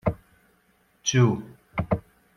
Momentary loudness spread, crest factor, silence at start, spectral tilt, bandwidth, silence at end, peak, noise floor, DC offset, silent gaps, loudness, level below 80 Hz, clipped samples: 13 LU; 18 dB; 0.05 s; -5 dB/octave; 7 kHz; 0.35 s; -8 dBFS; -64 dBFS; under 0.1%; none; -26 LUFS; -48 dBFS; under 0.1%